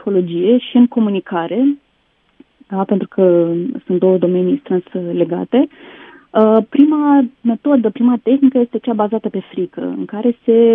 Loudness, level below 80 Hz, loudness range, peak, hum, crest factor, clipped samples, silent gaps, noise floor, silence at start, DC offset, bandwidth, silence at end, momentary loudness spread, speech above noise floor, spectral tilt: -15 LUFS; -66 dBFS; 3 LU; 0 dBFS; none; 14 dB; under 0.1%; none; -60 dBFS; 0.05 s; under 0.1%; 3.8 kHz; 0 s; 10 LU; 46 dB; -11 dB/octave